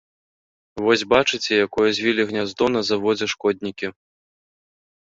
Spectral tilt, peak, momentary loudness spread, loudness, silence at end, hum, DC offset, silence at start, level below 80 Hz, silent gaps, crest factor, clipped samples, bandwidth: -4 dB/octave; -2 dBFS; 10 LU; -20 LUFS; 1.1 s; none; under 0.1%; 0.75 s; -56 dBFS; none; 20 dB; under 0.1%; 7.8 kHz